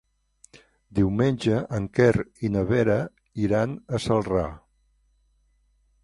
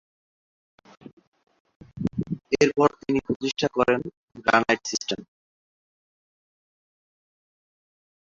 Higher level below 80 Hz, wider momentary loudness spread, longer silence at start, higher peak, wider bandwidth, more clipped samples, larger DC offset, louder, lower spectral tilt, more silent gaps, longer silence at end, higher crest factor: first, -46 dBFS vs -58 dBFS; second, 8 LU vs 11 LU; second, 0.9 s vs 1.95 s; about the same, -6 dBFS vs -4 dBFS; first, 11.5 kHz vs 7.6 kHz; neither; neither; about the same, -25 LUFS vs -24 LUFS; first, -7.5 dB/octave vs -4.5 dB/octave; second, none vs 3.36-3.40 s, 4.17-4.28 s; second, 1.45 s vs 3.05 s; about the same, 20 dB vs 24 dB